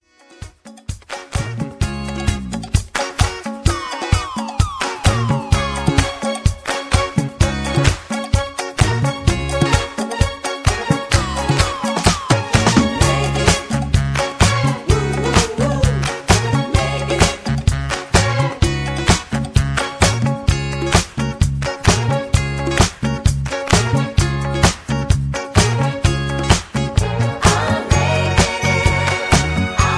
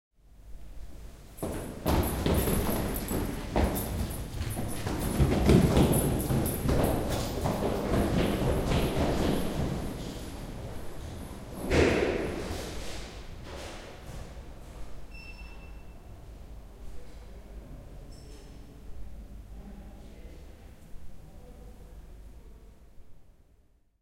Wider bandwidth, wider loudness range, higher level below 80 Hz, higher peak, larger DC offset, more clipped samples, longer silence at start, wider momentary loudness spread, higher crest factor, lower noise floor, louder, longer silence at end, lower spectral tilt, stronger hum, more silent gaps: second, 11 kHz vs 16 kHz; second, 3 LU vs 22 LU; first, -26 dBFS vs -38 dBFS; first, 0 dBFS vs -8 dBFS; neither; neither; about the same, 0.4 s vs 0.35 s; second, 7 LU vs 24 LU; second, 16 dB vs 24 dB; second, -38 dBFS vs -63 dBFS; first, -17 LUFS vs -30 LUFS; second, 0 s vs 0.7 s; second, -4.5 dB/octave vs -6 dB/octave; neither; neither